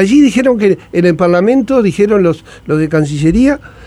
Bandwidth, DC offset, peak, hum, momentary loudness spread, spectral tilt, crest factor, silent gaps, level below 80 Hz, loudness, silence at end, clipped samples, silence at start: 11.5 kHz; under 0.1%; 0 dBFS; none; 5 LU; -7 dB/octave; 10 dB; none; -34 dBFS; -11 LUFS; 0 s; under 0.1%; 0 s